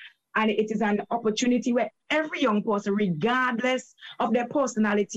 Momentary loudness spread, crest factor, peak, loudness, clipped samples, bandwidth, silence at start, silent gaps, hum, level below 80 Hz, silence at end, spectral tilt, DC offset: 4 LU; 14 dB; -12 dBFS; -25 LUFS; under 0.1%; 8.4 kHz; 0 s; none; none; -66 dBFS; 0 s; -5 dB/octave; under 0.1%